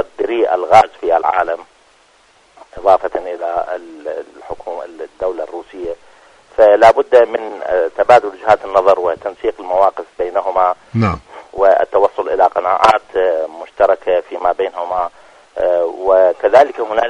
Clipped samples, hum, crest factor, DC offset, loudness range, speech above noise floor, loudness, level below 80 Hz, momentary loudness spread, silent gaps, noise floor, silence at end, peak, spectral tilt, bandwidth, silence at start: 0.2%; none; 14 dB; under 0.1%; 8 LU; 37 dB; -14 LUFS; -46 dBFS; 16 LU; none; -51 dBFS; 0 s; 0 dBFS; -6 dB/octave; 10.5 kHz; 0 s